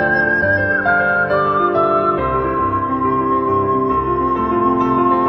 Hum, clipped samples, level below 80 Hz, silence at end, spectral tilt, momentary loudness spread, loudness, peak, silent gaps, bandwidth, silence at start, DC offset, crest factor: none; under 0.1%; -38 dBFS; 0 s; -9 dB/octave; 3 LU; -16 LUFS; -4 dBFS; none; 6.2 kHz; 0 s; under 0.1%; 12 dB